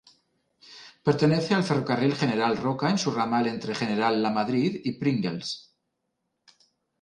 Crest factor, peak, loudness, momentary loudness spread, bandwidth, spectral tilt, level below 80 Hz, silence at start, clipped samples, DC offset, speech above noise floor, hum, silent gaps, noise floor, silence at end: 18 dB; -8 dBFS; -26 LUFS; 7 LU; 11 kHz; -6 dB/octave; -66 dBFS; 0.7 s; under 0.1%; under 0.1%; 54 dB; none; none; -79 dBFS; 1.4 s